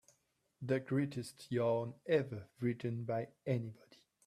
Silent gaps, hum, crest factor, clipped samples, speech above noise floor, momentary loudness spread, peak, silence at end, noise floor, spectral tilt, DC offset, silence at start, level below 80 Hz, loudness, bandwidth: none; none; 18 dB; under 0.1%; 41 dB; 9 LU; -20 dBFS; 0.55 s; -79 dBFS; -7.5 dB/octave; under 0.1%; 0.6 s; -76 dBFS; -38 LUFS; 14 kHz